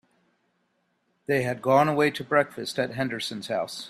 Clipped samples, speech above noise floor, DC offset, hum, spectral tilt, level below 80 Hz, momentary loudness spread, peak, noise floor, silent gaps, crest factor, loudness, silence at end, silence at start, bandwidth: under 0.1%; 47 dB; under 0.1%; none; -5 dB/octave; -66 dBFS; 9 LU; -6 dBFS; -72 dBFS; none; 20 dB; -25 LUFS; 0 s; 1.3 s; 16 kHz